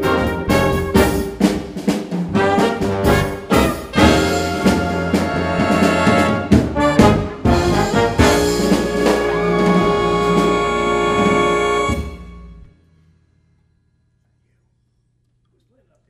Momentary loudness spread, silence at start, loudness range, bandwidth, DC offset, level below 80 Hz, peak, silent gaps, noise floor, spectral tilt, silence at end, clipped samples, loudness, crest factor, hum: 5 LU; 0 s; 5 LU; 16 kHz; under 0.1%; -30 dBFS; 0 dBFS; none; -63 dBFS; -5.5 dB/octave; 3.45 s; under 0.1%; -16 LUFS; 16 dB; none